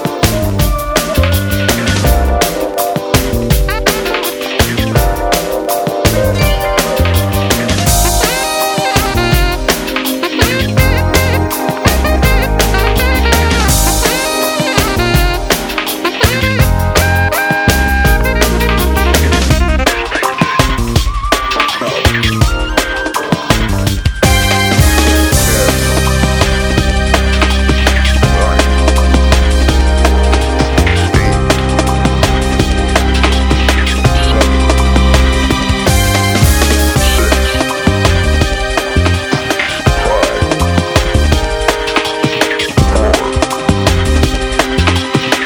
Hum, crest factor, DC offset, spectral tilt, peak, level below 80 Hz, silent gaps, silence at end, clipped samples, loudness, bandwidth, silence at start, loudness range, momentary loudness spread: none; 10 dB; under 0.1%; -4.5 dB/octave; 0 dBFS; -16 dBFS; none; 0 s; 0.1%; -12 LUFS; over 20 kHz; 0 s; 2 LU; 4 LU